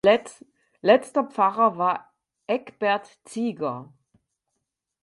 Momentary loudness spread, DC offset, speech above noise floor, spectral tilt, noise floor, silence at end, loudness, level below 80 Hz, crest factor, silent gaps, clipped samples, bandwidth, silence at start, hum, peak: 15 LU; under 0.1%; 58 dB; -5 dB/octave; -81 dBFS; 1.2 s; -24 LUFS; -70 dBFS; 20 dB; none; under 0.1%; 11.5 kHz; 0.05 s; none; -4 dBFS